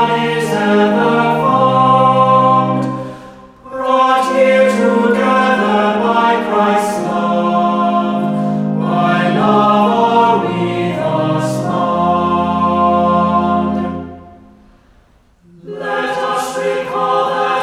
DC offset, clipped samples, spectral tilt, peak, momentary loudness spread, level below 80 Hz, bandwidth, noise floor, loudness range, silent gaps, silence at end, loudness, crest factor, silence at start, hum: under 0.1%; under 0.1%; -6.5 dB/octave; 0 dBFS; 8 LU; -50 dBFS; 13.5 kHz; -50 dBFS; 6 LU; none; 0 s; -13 LUFS; 14 dB; 0 s; none